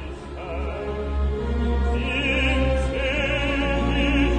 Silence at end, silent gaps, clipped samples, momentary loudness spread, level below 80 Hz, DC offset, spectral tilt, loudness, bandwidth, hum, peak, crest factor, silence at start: 0 s; none; under 0.1%; 9 LU; -26 dBFS; under 0.1%; -6.5 dB/octave; -23 LUFS; 9.2 kHz; none; -10 dBFS; 14 dB; 0 s